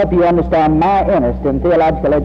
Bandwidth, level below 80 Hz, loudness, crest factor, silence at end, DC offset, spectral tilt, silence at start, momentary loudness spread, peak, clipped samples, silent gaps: 6.4 kHz; -26 dBFS; -13 LUFS; 8 dB; 0 s; under 0.1%; -9.5 dB/octave; 0 s; 3 LU; -4 dBFS; under 0.1%; none